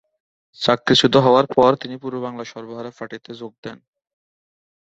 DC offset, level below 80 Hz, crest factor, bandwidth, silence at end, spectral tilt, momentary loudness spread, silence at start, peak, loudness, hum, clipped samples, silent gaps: under 0.1%; -56 dBFS; 20 dB; 8.2 kHz; 1.15 s; -5 dB/octave; 20 LU; 0.6 s; 0 dBFS; -17 LUFS; none; under 0.1%; 3.58-3.63 s